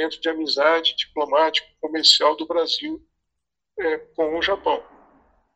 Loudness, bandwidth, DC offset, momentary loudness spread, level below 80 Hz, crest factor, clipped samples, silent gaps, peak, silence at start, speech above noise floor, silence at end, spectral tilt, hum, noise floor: -20 LUFS; 11 kHz; under 0.1%; 13 LU; -60 dBFS; 22 dB; under 0.1%; none; -2 dBFS; 0 s; 61 dB; 0.75 s; -1 dB/octave; none; -82 dBFS